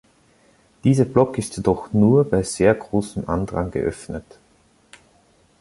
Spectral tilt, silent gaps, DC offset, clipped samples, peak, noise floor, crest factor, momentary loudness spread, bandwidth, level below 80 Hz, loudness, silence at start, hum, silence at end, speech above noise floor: -7 dB/octave; none; under 0.1%; under 0.1%; -2 dBFS; -58 dBFS; 20 dB; 10 LU; 11.5 kHz; -44 dBFS; -20 LUFS; 0.85 s; none; 1.4 s; 38 dB